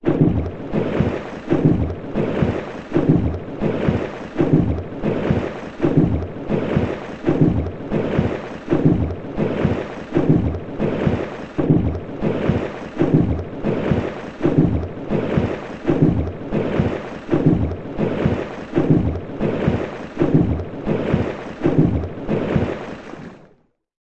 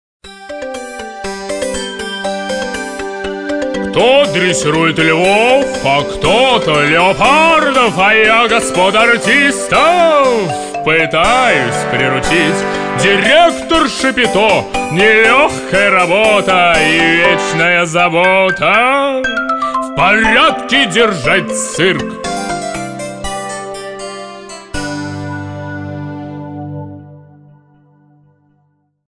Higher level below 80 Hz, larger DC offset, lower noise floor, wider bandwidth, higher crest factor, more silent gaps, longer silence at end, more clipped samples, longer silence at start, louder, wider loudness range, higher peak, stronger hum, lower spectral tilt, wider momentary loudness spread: about the same, -36 dBFS vs -38 dBFS; neither; about the same, -57 dBFS vs -59 dBFS; second, 7.6 kHz vs 10 kHz; first, 18 dB vs 12 dB; neither; second, 0.75 s vs 1.9 s; neither; second, 0 s vs 0.25 s; second, -21 LUFS vs -11 LUFS; second, 1 LU vs 14 LU; about the same, -2 dBFS vs 0 dBFS; neither; first, -9.5 dB/octave vs -3.5 dB/octave; second, 8 LU vs 16 LU